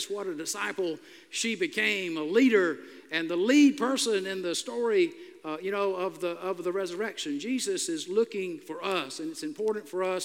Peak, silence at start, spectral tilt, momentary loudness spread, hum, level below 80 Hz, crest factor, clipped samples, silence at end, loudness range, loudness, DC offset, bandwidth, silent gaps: -10 dBFS; 0 s; -3 dB/octave; 12 LU; none; -90 dBFS; 18 dB; under 0.1%; 0 s; 6 LU; -29 LUFS; under 0.1%; 16 kHz; none